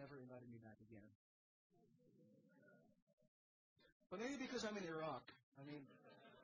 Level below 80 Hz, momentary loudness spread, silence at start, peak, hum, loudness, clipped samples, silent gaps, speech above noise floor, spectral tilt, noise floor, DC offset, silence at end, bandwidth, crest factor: -88 dBFS; 18 LU; 0 s; -36 dBFS; none; -52 LUFS; under 0.1%; 1.15-1.70 s, 3.02-3.07 s, 3.13-3.18 s, 3.28-3.76 s, 3.92-4.00 s, 5.43-5.52 s; 25 dB; -4 dB/octave; -75 dBFS; under 0.1%; 0 s; 6.6 kHz; 20 dB